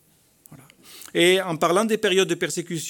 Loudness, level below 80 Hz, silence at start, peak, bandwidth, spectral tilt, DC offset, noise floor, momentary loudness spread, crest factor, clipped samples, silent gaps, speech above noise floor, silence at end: -21 LUFS; -72 dBFS; 0.5 s; -4 dBFS; 19 kHz; -3.5 dB/octave; under 0.1%; -56 dBFS; 9 LU; 20 dB; under 0.1%; none; 35 dB; 0 s